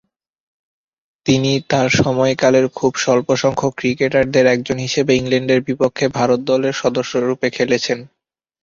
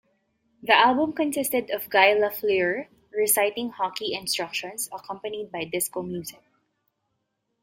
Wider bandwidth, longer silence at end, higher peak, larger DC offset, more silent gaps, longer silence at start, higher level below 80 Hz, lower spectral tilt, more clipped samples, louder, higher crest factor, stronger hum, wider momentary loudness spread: second, 7.6 kHz vs 16.5 kHz; second, 0.55 s vs 1.3 s; about the same, -2 dBFS vs -2 dBFS; neither; neither; first, 1.25 s vs 0.65 s; first, -50 dBFS vs -68 dBFS; first, -5 dB/octave vs -2 dB/octave; neither; first, -16 LUFS vs -24 LUFS; second, 16 dB vs 24 dB; neither; second, 5 LU vs 15 LU